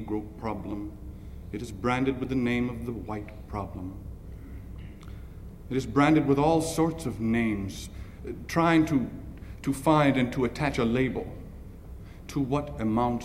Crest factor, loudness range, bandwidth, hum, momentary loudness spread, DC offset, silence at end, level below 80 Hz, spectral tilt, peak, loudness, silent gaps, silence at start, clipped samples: 20 dB; 7 LU; 16 kHz; none; 21 LU; under 0.1%; 0 s; -44 dBFS; -6.5 dB/octave; -8 dBFS; -27 LUFS; none; 0 s; under 0.1%